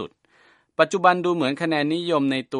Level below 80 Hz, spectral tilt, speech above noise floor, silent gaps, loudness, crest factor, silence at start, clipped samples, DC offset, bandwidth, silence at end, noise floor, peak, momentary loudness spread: -70 dBFS; -5.5 dB/octave; 37 dB; none; -21 LUFS; 22 dB; 0 s; under 0.1%; under 0.1%; 11 kHz; 0 s; -58 dBFS; 0 dBFS; 7 LU